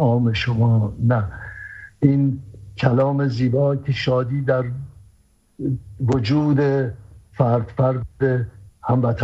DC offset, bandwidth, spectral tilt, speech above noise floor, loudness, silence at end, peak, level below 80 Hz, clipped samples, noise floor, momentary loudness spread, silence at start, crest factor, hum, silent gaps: under 0.1%; 7.4 kHz; -8.5 dB/octave; 38 dB; -20 LUFS; 0 s; -2 dBFS; -46 dBFS; under 0.1%; -57 dBFS; 14 LU; 0 s; 18 dB; none; none